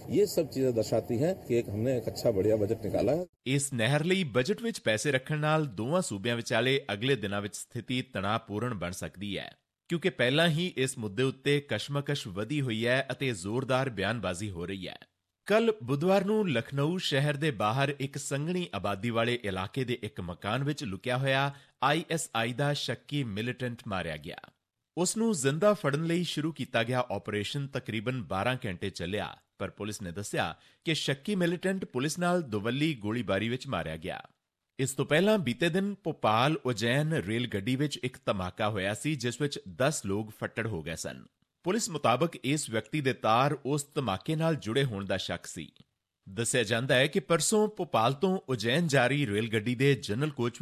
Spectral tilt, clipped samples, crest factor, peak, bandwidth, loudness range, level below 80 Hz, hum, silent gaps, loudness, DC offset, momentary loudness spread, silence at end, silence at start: -5 dB/octave; under 0.1%; 18 dB; -12 dBFS; 14.5 kHz; 4 LU; -58 dBFS; none; 3.29-3.33 s; -30 LUFS; under 0.1%; 10 LU; 0 s; 0 s